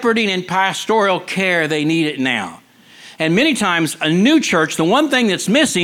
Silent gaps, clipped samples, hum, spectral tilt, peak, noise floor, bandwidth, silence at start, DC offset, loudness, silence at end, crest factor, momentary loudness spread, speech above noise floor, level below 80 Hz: none; under 0.1%; none; -4 dB/octave; -2 dBFS; -42 dBFS; 16.5 kHz; 0 s; under 0.1%; -16 LUFS; 0 s; 14 dB; 4 LU; 27 dB; -60 dBFS